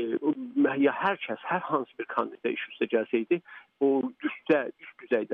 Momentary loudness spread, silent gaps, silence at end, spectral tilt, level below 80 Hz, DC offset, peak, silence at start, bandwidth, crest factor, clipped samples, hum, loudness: 7 LU; none; 0 s; -8 dB/octave; -80 dBFS; under 0.1%; -12 dBFS; 0 s; 4.6 kHz; 16 dB; under 0.1%; none; -29 LUFS